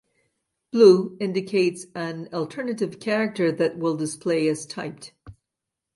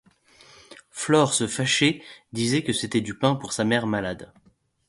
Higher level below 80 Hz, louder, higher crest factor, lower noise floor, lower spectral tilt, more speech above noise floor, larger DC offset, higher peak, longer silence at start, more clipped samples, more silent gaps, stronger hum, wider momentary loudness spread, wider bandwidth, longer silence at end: second, -66 dBFS vs -58 dBFS; about the same, -23 LUFS vs -23 LUFS; about the same, 22 dB vs 20 dB; first, -85 dBFS vs -55 dBFS; first, -5.5 dB/octave vs -4 dB/octave; first, 63 dB vs 31 dB; neither; about the same, -2 dBFS vs -4 dBFS; about the same, 0.75 s vs 0.7 s; neither; neither; neither; first, 17 LU vs 14 LU; about the same, 11.5 kHz vs 11.5 kHz; about the same, 0.65 s vs 0.65 s